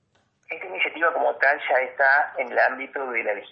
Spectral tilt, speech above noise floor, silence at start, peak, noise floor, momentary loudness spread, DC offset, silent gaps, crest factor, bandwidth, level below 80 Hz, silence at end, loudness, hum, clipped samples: -4.5 dB/octave; 36 dB; 0.5 s; -6 dBFS; -58 dBFS; 11 LU; under 0.1%; none; 16 dB; 5.6 kHz; -80 dBFS; 0.05 s; -22 LUFS; none; under 0.1%